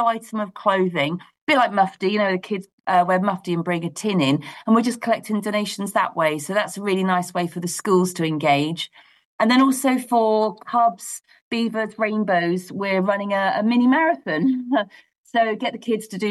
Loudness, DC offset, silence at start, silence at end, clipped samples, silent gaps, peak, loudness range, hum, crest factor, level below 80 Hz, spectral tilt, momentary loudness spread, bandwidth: -21 LUFS; under 0.1%; 0 s; 0 s; under 0.1%; 1.41-1.47 s, 2.73-2.78 s, 9.25-9.38 s, 11.41-11.51 s, 15.18-15.24 s; -6 dBFS; 2 LU; none; 16 dB; -70 dBFS; -5 dB/octave; 8 LU; 12.5 kHz